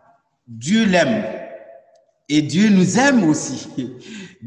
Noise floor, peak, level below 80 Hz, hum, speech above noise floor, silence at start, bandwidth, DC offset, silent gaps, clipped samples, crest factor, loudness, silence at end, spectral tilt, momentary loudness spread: -55 dBFS; -4 dBFS; -58 dBFS; none; 38 dB; 0.5 s; 10.5 kHz; under 0.1%; none; under 0.1%; 14 dB; -17 LUFS; 0 s; -5 dB/octave; 18 LU